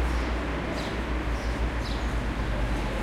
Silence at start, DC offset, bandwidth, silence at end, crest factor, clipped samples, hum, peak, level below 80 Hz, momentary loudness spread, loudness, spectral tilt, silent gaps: 0 s; under 0.1%; 12 kHz; 0 s; 12 dB; under 0.1%; none; -16 dBFS; -30 dBFS; 1 LU; -30 LUFS; -6 dB/octave; none